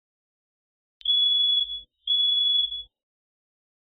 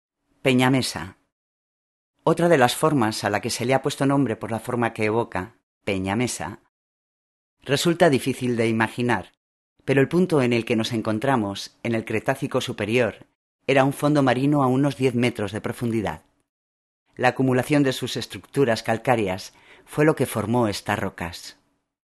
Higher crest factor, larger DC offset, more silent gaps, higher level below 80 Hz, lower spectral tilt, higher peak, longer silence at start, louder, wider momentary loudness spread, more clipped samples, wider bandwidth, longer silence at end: second, 12 dB vs 22 dB; neither; second, none vs 1.32-2.14 s, 5.63-5.81 s, 6.69-7.57 s, 9.37-9.76 s, 13.35-13.59 s, 16.49-17.06 s; about the same, -62 dBFS vs -58 dBFS; second, 3.5 dB/octave vs -5.5 dB/octave; second, -16 dBFS vs 0 dBFS; first, 1.05 s vs 0.45 s; about the same, -21 LUFS vs -23 LUFS; about the same, 12 LU vs 12 LU; neither; second, 4.5 kHz vs 13 kHz; first, 1.15 s vs 0.6 s